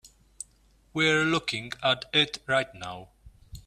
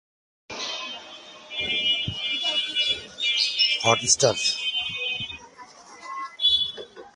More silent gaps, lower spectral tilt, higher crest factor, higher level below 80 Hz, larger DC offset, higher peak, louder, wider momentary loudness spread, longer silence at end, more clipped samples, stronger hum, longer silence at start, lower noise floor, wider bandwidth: neither; first, -3.5 dB/octave vs -1 dB/octave; about the same, 20 dB vs 22 dB; about the same, -56 dBFS vs -58 dBFS; neither; second, -10 dBFS vs -4 dBFS; second, -26 LUFS vs -22 LUFS; about the same, 20 LU vs 19 LU; about the same, 0.05 s vs 0.05 s; neither; neither; second, 0.05 s vs 0.5 s; first, -62 dBFS vs -47 dBFS; first, 14.5 kHz vs 11.5 kHz